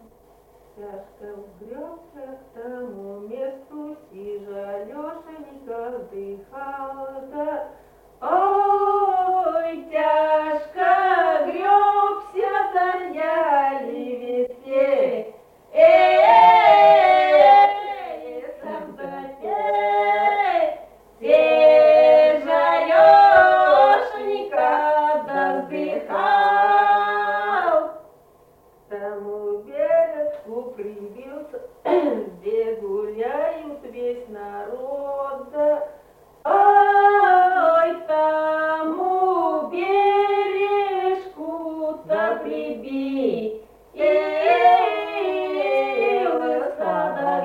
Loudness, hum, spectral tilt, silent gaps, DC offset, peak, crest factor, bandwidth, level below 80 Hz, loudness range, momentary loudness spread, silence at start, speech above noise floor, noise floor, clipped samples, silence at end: -18 LUFS; none; -5 dB/octave; none; under 0.1%; -2 dBFS; 18 dB; 5.6 kHz; -60 dBFS; 19 LU; 21 LU; 0.8 s; 32 dB; -54 dBFS; under 0.1%; 0 s